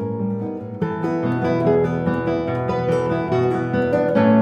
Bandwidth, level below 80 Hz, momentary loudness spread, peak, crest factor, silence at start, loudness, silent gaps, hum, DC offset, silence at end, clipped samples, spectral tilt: 8.4 kHz; -48 dBFS; 7 LU; -2 dBFS; 16 dB; 0 s; -21 LUFS; none; none; under 0.1%; 0 s; under 0.1%; -9 dB/octave